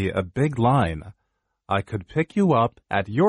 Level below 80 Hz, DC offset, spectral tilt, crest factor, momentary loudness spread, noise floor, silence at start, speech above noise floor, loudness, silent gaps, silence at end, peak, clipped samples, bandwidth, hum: -48 dBFS; under 0.1%; -8 dB/octave; 16 dB; 7 LU; -73 dBFS; 0 s; 51 dB; -23 LUFS; none; 0 s; -6 dBFS; under 0.1%; 11 kHz; none